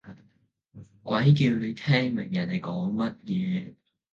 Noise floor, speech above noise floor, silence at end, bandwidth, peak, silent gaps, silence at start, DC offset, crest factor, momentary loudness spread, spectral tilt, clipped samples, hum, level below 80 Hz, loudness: -66 dBFS; 41 dB; 0.4 s; 7.2 kHz; -6 dBFS; none; 0.05 s; under 0.1%; 20 dB; 10 LU; -8 dB/octave; under 0.1%; none; -64 dBFS; -26 LUFS